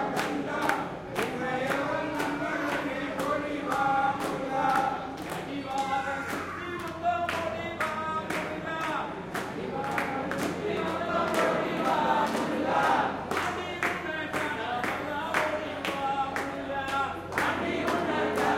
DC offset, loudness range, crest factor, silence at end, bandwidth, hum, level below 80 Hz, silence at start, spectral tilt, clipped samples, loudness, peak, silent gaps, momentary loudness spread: under 0.1%; 4 LU; 20 dB; 0 s; 16.5 kHz; none; -60 dBFS; 0 s; -4.5 dB/octave; under 0.1%; -30 LUFS; -10 dBFS; none; 7 LU